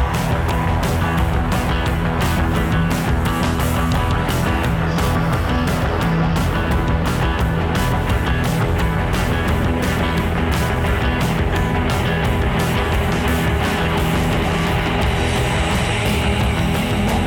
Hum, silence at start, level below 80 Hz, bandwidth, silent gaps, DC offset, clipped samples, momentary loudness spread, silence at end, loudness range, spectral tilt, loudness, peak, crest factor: none; 0 s; -24 dBFS; 19.5 kHz; none; under 0.1%; under 0.1%; 1 LU; 0 s; 1 LU; -6 dB/octave; -19 LUFS; -8 dBFS; 10 dB